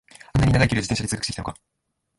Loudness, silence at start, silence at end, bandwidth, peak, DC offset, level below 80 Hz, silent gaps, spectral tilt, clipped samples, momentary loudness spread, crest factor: -22 LUFS; 0.35 s; 0.65 s; 11.5 kHz; -4 dBFS; under 0.1%; -38 dBFS; none; -5 dB/octave; under 0.1%; 12 LU; 20 dB